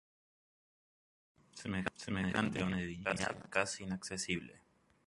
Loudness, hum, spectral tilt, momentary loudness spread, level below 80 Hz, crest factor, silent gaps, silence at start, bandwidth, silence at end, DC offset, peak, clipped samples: -38 LUFS; none; -4.5 dB/octave; 7 LU; -62 dBFS; 26 dB; none; 1.55 s; 11.5 kHz; 0.5 s; under 0.1%; -14 dBFS; under 0.1%